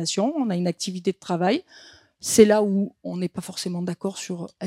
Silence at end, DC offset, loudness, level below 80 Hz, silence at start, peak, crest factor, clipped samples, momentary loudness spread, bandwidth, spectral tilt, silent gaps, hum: 0 s; under 0.1%; -24 LUFS; -64 dBFS; 0 s; -2 dBFS; 22 dB; under 0.1%; 14 LU; 16.5 kHz; -5 dB/octave; none; none